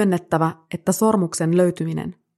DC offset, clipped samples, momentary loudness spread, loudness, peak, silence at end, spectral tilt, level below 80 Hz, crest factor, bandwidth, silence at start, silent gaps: under 0.1%; under 0.1%; 8 LU; -21 LUFS; -4 dBFS; 0.25 s; -6 dB/octave; -60 dBFS; 16 dB; 14 kHz; 0 s; none